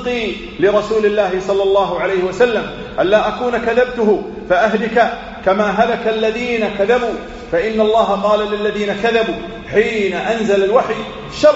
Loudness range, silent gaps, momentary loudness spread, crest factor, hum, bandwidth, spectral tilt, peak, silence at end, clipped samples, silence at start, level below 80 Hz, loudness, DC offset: 1 LU; none; 6 LU; 16 dB; none; 8 kHz; -3 dB/octave; 0 dBFS; 0 s; under 0.1%; 0 s; -42 dBFS; -16 LUFS; under 0.1%